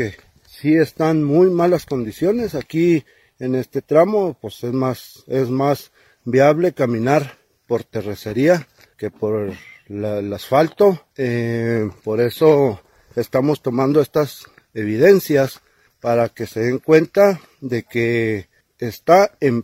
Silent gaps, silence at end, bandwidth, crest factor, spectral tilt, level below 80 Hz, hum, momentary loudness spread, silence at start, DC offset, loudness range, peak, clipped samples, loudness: none; 0 s; 16 kHz; 18 dB; -7 dB/octave; -56 dBFS; none; 13 LU; 0 s; under 0.1%; 3 LU; 0 dBFS; under 0.1%; -18 LUFS